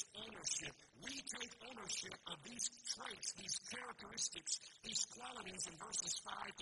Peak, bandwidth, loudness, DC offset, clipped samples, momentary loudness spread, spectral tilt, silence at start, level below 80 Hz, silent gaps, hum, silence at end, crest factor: -26 dBFS; 11.5 kHz; -45 LUFS; under 0.1%; under 0.1%; 8 LU; 0 dB/octave; 0 s; -78 dBFS; none; none; 0 s; 22 dB